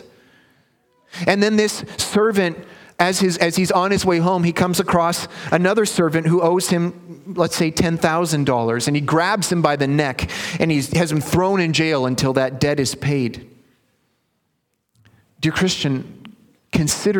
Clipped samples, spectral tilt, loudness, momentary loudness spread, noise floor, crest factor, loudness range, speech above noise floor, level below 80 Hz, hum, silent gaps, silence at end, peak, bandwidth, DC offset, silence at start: under 0.1%; -5 dB/octave; -19 LUFS; 7 LU; -71 dBFS; 20 dB; 7 LU; 52 dB; -48 dBFS; none; none; 0 s; 0 dBFS; 19 kHz; under 0.1%; 1.15 s